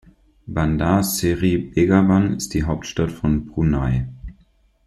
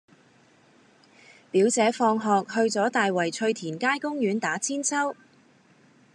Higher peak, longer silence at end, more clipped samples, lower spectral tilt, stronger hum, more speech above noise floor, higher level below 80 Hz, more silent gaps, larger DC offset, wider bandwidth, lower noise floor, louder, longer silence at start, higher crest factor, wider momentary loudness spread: first, -4 dBFS vs -8 dBFS; second, 0.55 s vs 1 s; neither; first, -6 dB/octave vs -3.5 dB/octave; neither; first, 38 dB vs 34 dB; first, -34 dBFS vs -86 dBFS; neither; neither; first, 13.5 kHz vs 11.5 kHz; about the same, -57 dBFS vs -59 dBFS; first, -20 LUFS vs -25 LUFS; second, 0.45 s vs 1.55 s; about the same, 16 dB vs 18 dB; first, 9 LU vs 6 LU